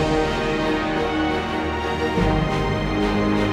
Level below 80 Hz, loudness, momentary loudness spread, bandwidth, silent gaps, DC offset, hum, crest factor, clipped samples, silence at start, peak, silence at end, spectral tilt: -32 dBFS; -22 LUFS; 3 LU; 13 kHz; none; under 0.1%; none; 14 dB; under 0.1%; 0 s; -8 dBFS; 0 s; -6 dB/octave